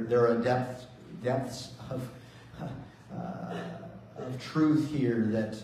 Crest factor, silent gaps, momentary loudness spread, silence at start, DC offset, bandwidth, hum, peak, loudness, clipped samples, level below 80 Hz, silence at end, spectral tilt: 16 dB; none; 19 LU; 0 s; under 0.1%; 13.5 kHz; none; -14 dBFS; -31 LUFS; under 0.1%; -62 dBFS; 0 s; -7 dB/octave